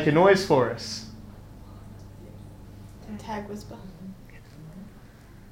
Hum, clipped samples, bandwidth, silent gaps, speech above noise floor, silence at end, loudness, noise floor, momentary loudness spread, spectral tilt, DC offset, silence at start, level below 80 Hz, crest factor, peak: none; under 0.1%; 16 kHz; none; 25 dB; 0.45 s; -24 LUFS; -48 dBFS; 27 LU; -5.5 dB/octave; under 0.1%; 0 s; -50 dBFS; 22 dB; -6 dBFS